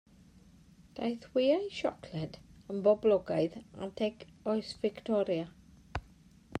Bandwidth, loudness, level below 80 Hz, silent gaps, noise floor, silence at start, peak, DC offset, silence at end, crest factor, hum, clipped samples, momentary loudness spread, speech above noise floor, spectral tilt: 10 kHz; -33 LUFS; -60 dBFS; none; -59 dBFS; 0.95 s; -16 dBFS; under 0.1%; 0 s; 18 dB; none; under 0.1%; 15 LU; 27 dB; -6.5 dB/octave